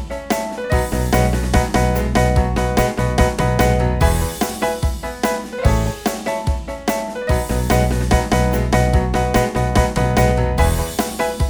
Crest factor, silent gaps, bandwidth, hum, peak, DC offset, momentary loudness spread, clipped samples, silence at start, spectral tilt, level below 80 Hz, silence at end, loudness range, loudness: 16 dB; none; over 20 kHz; none; 0 dBFS; under 0.1%; 6 LU; under 0.1%; 0 s; -5.5 dB/octave; -22 dBFS; 0 s; 3 LU; -18 LUFS